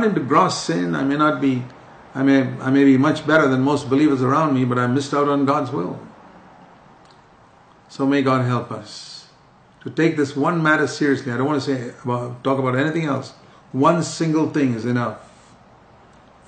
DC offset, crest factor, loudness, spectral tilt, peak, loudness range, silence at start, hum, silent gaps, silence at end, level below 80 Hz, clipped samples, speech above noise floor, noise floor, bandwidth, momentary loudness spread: under 0.1%; 18 dB; -19 LUFS; -6.5 dB/octave; -2 dBFS; 7 LU; 0 s; none; none; 1.25 s; -62 dBFS; under 0.1%; 32 dB; -51 dBFS; 9.2 kHz; 14 LU